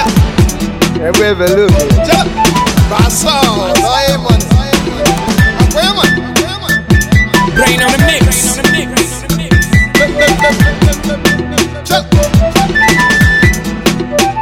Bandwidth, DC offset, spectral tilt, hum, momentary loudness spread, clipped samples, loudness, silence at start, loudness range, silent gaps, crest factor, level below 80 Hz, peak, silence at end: 19 kHz; 0.3%; -4.5 dB/octave; none; 5 LU; 0.6%; -9 LUFS; 0 s; 1 LU; none; 10 dB; -18 dBFS; 0 dBFS; 0 s